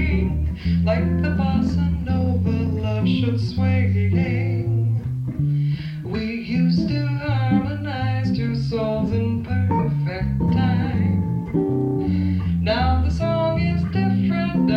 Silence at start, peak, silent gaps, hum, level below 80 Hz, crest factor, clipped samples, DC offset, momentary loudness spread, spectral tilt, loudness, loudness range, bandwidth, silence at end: 0 s; -8 dBFS; none; none; -32 dBFS; 12 dB; under 0.1%; under 0.1%; 4 LU; -9 dB/octave; -21 LUFS; 1 LU; 6.8 kHz; 0 s